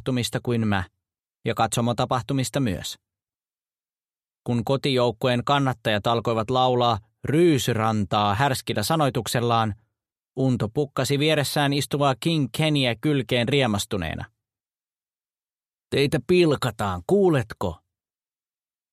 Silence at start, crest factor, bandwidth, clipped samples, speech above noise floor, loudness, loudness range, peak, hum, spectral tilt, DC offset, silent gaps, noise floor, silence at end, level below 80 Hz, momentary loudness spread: 0.05 s; 20 dB; 15 kHz; under 0.1%; over 67 dB; -23 LUFS; 5 LU; -4 dBFS; none; -5.5 dB/octave; under 0.1%; none; under -90 dBFS; 1.15 s; -54 dBFS; 9 LU